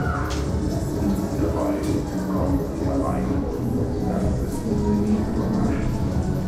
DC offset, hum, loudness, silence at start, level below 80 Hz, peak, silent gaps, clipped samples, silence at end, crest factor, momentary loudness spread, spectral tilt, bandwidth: under 0.1%; none; -24 LUFS; 0 s; -30 dBFS; -10 dBFS; none; under 0.1%; 0 s; 14 dB; 3 LU; -7.5 dB/octave; 15 kHz